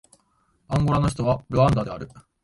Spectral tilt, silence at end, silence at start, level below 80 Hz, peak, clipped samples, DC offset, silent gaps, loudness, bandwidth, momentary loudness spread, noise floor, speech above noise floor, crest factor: -7.5 dB/octave; 0.25 s; 0.7 s; -40 dBFS; -6 dBFS; under 0.1%; under 0.1%; none; -23 LUFS; 11.5 kHz; 14 LU; -66 dBFS; 44 dB; 16 dB